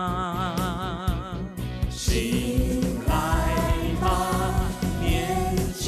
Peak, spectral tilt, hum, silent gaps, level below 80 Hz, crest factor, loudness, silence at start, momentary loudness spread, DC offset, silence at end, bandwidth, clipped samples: -12 dBFS; -5.5 dB/octave; none; none; -30 dBFS; 12 dB; -26 LUFS; 0 s; 6 LU; under 0.1%; 0 s; 14 kHz; under 0.1%